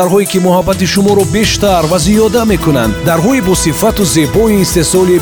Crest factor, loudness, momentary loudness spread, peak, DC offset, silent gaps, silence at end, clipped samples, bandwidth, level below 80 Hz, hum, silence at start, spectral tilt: 8 dB; -10 LUFS; 2 LU; 0 dBFS; 0.3%; none; 0 s; under 0.1%; over 20 kHz; -26 dBFS; none; 0 s; -5 dB/octave